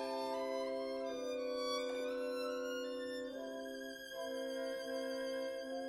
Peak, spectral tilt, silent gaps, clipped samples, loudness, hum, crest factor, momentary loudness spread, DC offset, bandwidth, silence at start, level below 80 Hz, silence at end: -28 dBFS; -2.5 dB/octave; none; under 0.1%; -42 LUFS; none; 14 dB; 6 LU; under 0.1%; 15.5 kHz; 0 s; -76 dBFS; 0 s